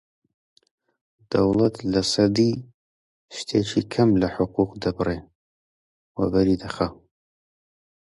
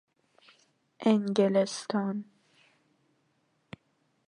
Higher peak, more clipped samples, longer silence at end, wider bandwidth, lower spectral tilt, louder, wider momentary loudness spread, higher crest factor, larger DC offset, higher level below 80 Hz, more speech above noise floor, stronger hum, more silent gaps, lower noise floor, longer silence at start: first, -6 dBFS vs -10 dBFS; neither; second, 1.25 s vs 2.05 s; about the same, 11.5 kHz vs 10.5 kHz; about the same, -6 dB/octave vs -6 dB/octave; first, -23 LUFS vs -28 LUFS; second, 10 LU vs 26 LU; about the same, 18 dB vs 22 dB; neither; first, -48 dBFS vs -80 dBFS; first, over 68 dB vs 46 dB; neither; first, 2.74-3.29 s, 5.35-6.15 s vs none; first, under -90 dBFS vs -73 dBFS; first, 1.3 s vs 1 s